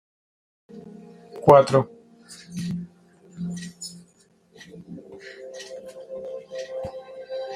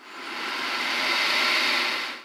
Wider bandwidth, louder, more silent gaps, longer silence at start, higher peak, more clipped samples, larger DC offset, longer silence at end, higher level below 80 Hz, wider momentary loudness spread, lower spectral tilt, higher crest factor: second, 14.5 kHz vs 17 kHz; about the same, -23 LUFS vs -23 LUFS; neither; first, 0.7 s vs 0 s; first, -2 dBFS vs -10 dBFS; neither; neither; about the same, 0 s vs 0 s; first, -62 dBFS vs -86 dBFS; first, 29 LU vs 10 LU; first, -6.5 dB/octave vs 0 dB/octave; first, 24 dB vs 16 dB